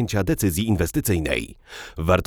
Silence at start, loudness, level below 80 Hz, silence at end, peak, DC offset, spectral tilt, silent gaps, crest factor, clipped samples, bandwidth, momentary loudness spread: 0 s; -23 LUFS; -36 dBFS; 0 s; -4 dBFS; under 0.1%; -5.5 dB/octave; none; 18 dB; under 0.1%; over 20 kHz; 15 LU